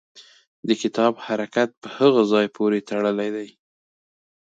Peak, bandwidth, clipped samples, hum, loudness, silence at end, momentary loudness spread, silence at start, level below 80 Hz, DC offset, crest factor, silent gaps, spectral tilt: -4 dBFS; 8 kHz; under 0.1%; none; -21 LUFS; 1 s; 10 LU; 0.15 s; -72 dBFS; under 0.1%; 18 dB; 0.47-0.63 s, 1.77-1.82 s; -5.5 dB/octave